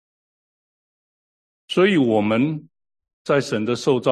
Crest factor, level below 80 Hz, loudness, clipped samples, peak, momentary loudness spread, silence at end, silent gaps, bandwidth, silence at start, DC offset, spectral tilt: 18 dB; -64 dBFS; -20 LUFS; under 0.1%; -4 dBFS; 8 LU; 0 s; 3.13-3.25 s; 12 kHz; 1.7 s; under 0.1%; -6 dB/octave